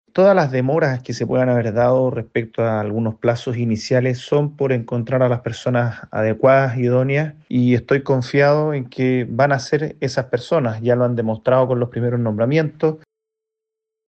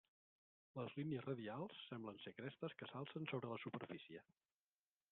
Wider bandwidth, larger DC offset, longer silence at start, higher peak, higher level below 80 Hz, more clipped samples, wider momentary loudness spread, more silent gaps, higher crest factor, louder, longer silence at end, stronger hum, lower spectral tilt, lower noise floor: first, 8.2 kHz vs 4.2 kHz; neither; second, 0.15 s vs 0.75 s; first, -2 dBFS vs -32 dBFS; first, -56 dBFS vs -88 dBFS; neither; about the same, 7 LU vs 7 LU; neither; about the same, 16 dB vs 20 dB; first, -18 LUFS vs -51 LUFS; first, 1.1 s vs 0.9 s; neither; first, -7.5 dB/octave vs -5 dB/octave; second, -83 dBFS vs under -90 dBFS